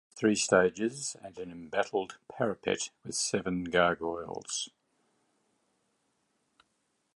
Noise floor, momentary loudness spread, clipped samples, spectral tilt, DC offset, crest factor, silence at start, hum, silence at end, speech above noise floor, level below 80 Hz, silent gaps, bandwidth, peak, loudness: -77 dBFS; 14 LU; under 0.1%; -3.5 dB/octave; under 0.1%; 24 dB; 0.15 s; none; 2.5 s; 46 dB; -64 dBFS; none; 11.5 kHz; -10 dBFS; -31 LUFS